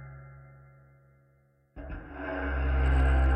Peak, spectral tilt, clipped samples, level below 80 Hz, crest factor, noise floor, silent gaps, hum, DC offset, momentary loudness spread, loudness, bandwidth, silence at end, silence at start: -16 dBFS; -8.5 dB/octave; under 0.1%; -30 dBFS; 14 dB; -66 dBFS; none; none; under 0.1%; 24 LU; -29 LUFS; 3.4 kHz; 0 s; 0 s